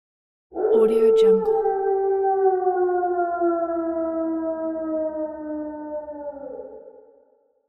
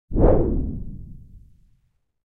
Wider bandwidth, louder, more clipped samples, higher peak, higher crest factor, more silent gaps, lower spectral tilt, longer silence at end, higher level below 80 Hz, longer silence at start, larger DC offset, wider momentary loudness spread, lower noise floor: first, 10.5 kHz vs 2.6 kHz; about the same, -22 LUFS vs -22 LUFS; neither; second, -8 dBFS vs -4 dBFS; second, 14 dB vs 20 dB; neither; second, -7.5 dB/octave vs -13.5 dB/octave; second, 0.8 s vs 0.95 s; second, -60 dBFS vs -28 dBFS; first, 0.5 s vs 0.1 s; neither; second, 17 LU vs 23 LU; second, -61 dBFS vs -66 dBFS